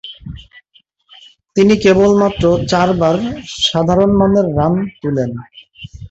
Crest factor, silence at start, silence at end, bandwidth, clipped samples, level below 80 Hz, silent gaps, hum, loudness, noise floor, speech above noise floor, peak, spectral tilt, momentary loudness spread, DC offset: 14 dB; 0.05 s; 0.05 s; 8 kHz; under 0.1%; -38 dBFS; none; none; -13 LUFS; -54 dBFS; 42 dB; -2 dBFS; -6 dB/octave; 21 LU; under 0.1%